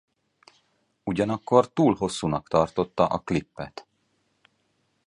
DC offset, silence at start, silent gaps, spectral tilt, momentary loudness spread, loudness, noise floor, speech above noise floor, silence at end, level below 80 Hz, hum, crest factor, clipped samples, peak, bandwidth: under 0.1%; 1.05 s; none; -6.5 dB/octave; 17 LU; -24 LUFS; -71 dBFS; 47 dB; 1.25 s; -54 dBFS; none; 24 dB; under 0.1%; -4 dBFS; 11 kHz